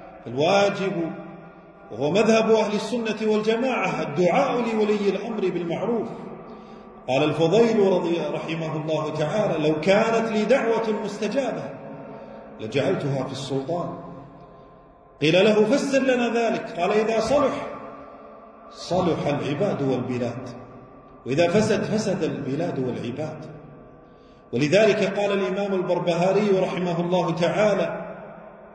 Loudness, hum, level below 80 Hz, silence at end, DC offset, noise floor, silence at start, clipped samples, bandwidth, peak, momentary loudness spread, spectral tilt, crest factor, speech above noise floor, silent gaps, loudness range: -23 LUFS; none; -58 dBFS; 0 s; under 0.1%; -50 dBFS; 0 s; under 0.1%; 10.5 kHz; -6 dBFS; 20 LU; -6 dB/octave; 16 dB; 28 dB; none; 5 LU